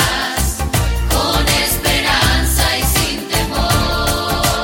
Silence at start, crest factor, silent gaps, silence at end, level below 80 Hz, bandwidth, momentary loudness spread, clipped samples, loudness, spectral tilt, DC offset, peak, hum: 0 s; 14 dB; none; 0 s; -22 dBFS; 17 kHz; 4 LU; under 0.1%; -15 LUFS; -3 dB/octave; under 0.1%; 0 dBFS; none